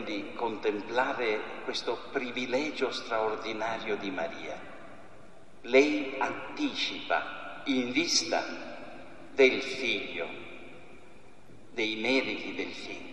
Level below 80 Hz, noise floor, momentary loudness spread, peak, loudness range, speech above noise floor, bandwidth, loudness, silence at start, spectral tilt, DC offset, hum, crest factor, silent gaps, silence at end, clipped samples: -68 dBFS; -55 dBFS; 19 LU; -10 dBFS; 4 LU; 25 dB; 12 kHz; -30 LUFS; 0 s; -2.5 dB/octave; 0.5%; none; 22 dB; none; 0 s; under 0.1%